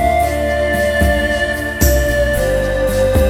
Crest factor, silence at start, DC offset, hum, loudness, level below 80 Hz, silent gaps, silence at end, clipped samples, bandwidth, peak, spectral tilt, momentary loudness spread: 14 dB; 0 s; under 0.1%; none; -15 LUFS; -20 dBFS; none; 0 s; under 0.1%; 17 kHz; 0 dBFS; -5 dB/octave; 2 LU